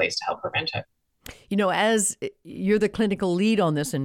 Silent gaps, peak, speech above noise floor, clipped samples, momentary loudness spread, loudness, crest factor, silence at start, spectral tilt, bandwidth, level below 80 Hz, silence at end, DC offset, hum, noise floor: none; -10 dBFS; 23 dB; under 0.1%; 12 LU; -24 LUFS; 14 dB; 0 s; -4 dB/octave; 16.5 kHz; -56 dBFS; 0 s; under 0.1%; none; -47 dBFS